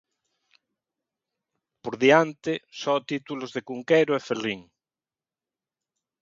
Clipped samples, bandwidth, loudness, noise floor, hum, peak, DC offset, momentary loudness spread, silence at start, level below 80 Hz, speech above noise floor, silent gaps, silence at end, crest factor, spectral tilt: under 0.1%; 7.6 kHz; -25 LUFS; under -90 dBFS; none; -4 dBFS; under 0.1%; 15 LU; 1.85 s; -72 dBFS; over 66 dB; none; 1.6 s; 24 dB; -5 dB/octave